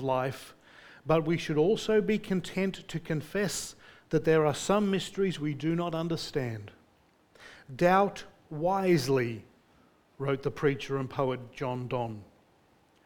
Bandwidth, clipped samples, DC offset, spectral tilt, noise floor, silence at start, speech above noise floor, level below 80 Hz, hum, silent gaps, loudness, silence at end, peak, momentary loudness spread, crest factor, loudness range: 19 kHz; under 0.1%; under 0.1%; -6 dB/octave; -65 dBFS; 0 s; 36 dB; -58 dBFS; none; none; -30 LUFS; 0.8 s; -10 dBFS; 13 LU; 20 dB; 3 LU